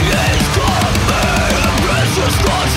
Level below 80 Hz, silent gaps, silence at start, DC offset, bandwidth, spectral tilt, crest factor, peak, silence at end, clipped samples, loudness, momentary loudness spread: -22 dBFS; none; 0 s; under 0.1%; 16 kHz; -4 dB/octave; 12 dB; -2 dBFS; 0 s; under 0.1%; -13 LUFS; 1 LU